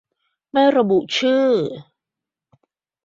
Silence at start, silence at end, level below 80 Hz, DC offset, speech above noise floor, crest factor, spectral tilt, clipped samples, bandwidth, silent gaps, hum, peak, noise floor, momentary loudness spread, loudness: 0.55 s; 1.25 s; -66 dBFS; under 0.1%; 69 dB; 16 dB; -5 dB/octave; under 0.1%; 7.6 kHz; none; none; -4 dBFS; -86 dBFS; 11 LU; -18 LUFS